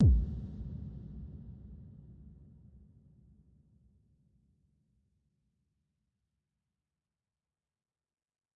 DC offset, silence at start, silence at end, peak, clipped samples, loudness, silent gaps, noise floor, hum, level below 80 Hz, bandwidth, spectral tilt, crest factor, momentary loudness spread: under 0.1%; 0 s; 6.25 s; -18 dBFS; under 0.1%; -37 LUFS; none; under -90 dBFS; none; -42 dBFS; 1.4 kHz; -12.5 dB/octave; 22 dB; 23 LU